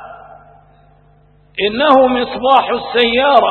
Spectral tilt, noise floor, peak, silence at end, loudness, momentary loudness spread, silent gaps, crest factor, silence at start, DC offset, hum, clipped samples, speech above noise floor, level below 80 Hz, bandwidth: -6 dB/octave; -49 dBFS; 0 dBFS; 0 s; -12 LUFS; 8 LU; none; 14 dB; 0 s; under 0.1%; 50 Hz at -45 dBFS; under 0.1%; 37 dB; -48 dBFS; 4.4 kHz